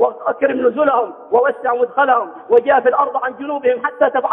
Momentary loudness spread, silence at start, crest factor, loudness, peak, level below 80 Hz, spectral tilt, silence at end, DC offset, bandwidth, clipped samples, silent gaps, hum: 6 LU; 0 s; 14 dB; -16 LUFS; -2 dBFS; -64 dBFS; -7.5 dB/octave; 0 s; under 0.1%; 3.8 kHz; under 0.1%; none; none